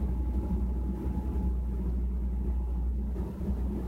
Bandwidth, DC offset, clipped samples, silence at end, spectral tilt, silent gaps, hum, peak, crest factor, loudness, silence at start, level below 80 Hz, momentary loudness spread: 2.8 kHz; under 0.1%; under 0.1%; 0 s; -10 dB/octave; none; none; -20 dBFS; 10 dB; -33 LUFS; 0 s; -30 dBFS; 2 LU